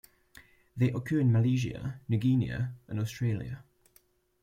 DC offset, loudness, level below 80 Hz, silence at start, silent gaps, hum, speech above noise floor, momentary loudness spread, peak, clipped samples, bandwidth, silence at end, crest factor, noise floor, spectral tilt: under 0.1%; -30 LUFS; -58 dBFS; 0.75 s; none; none; 38 dB; 13 LU; -14 dBFS; under 0.1%; 15 kHz; 0.8 s; 16 dB; -66 dBFS; -8 dB/octave